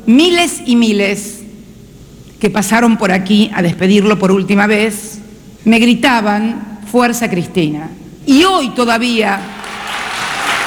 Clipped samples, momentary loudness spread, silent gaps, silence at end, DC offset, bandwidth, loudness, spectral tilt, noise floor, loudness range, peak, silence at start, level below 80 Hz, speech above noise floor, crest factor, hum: under 0.1%; 14 LU; none; 0 s; under 0.1%; over 20 kHz; -12 LUFS; -4.5 dB/octave; -36 dBFS; 2 LU; 0 dBFS; 0 s; -44 dBFS; 25 dB; 12 dB; none